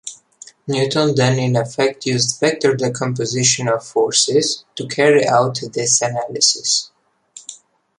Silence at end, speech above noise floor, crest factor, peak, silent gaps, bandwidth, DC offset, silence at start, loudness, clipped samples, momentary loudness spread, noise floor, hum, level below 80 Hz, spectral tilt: 0.45 s; 27 dB; 18 dB; 0 dBFS; none; 11.5 kHz; under 0.1%; 0.05 s; -16 LUFS; under 0.1%; 12 LU; -44 dBFS; none; -60 dBFS; -3.5 dB/octave